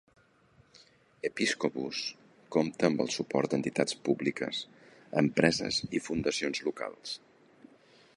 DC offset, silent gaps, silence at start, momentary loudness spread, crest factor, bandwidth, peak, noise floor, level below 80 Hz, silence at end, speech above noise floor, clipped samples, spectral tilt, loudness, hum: under 0.1%; none; 1.25 s; 11 LU; 24 dB; 11.5 kHz; -8 dBFS; -64 dBFS; -64 dBFS; 1 s; 33 dB; under 0.1%; -4.5 dB/octave; -31 LUFS; none